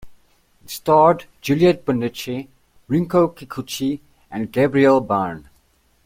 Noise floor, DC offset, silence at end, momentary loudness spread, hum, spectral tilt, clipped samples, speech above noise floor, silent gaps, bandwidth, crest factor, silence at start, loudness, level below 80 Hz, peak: -59 dBFS; under 0.1%; 0.65 s; 17 LU; none; -6.5 dB/octave; under 0.1%; 41 dB; none; 16.5 kHz; 18 dB; 0.05 s; -19 LUFS; -54 dBFS; -2 dBFS